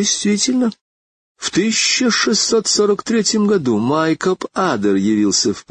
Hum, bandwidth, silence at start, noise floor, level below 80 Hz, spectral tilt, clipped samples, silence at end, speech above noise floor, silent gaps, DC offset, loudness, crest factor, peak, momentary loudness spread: none; 9.6 kHz; 0 s; under -90 dBFS; -56 dBFS; -3 dB/octave; under 0.1%; 0.1 s; over 74 dB; 0.81-1.35 s; under 0.1%; -16 LUFS; 14 dB; -4 dBFS; 5 LU